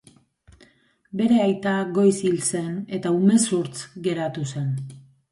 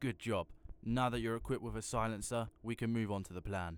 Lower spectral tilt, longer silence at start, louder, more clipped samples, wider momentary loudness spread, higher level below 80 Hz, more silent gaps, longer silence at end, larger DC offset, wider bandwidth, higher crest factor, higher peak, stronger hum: about the same, -5.5 dB/octave vs -5.5 dB/octave; first, 1.15 s vs 0 s; first, -22 LUFS vs -39 LUFS; neither; first, 11 LU vs 7 LU; second, -64 dBFS vs -54 dBFS; neither; first, 0.3 s vs 0 s; neither; second, 11.5 kHz vs 18 kHz; about the same, 16 dB vs 16 dB; first, -8 dBFS vs -22 dBFS; neither